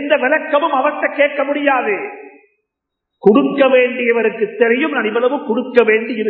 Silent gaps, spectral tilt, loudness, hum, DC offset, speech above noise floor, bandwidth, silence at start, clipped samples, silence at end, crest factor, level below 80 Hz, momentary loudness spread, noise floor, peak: none; -8 dB/octave; -15 LUFS; none; under 0.1%; 64 dB; 4.5 kHz; 0 s; under 0.1%; 0 s; 16 dB; -70 dBFS; 5 LU; -78 dBFS; 0 dBFS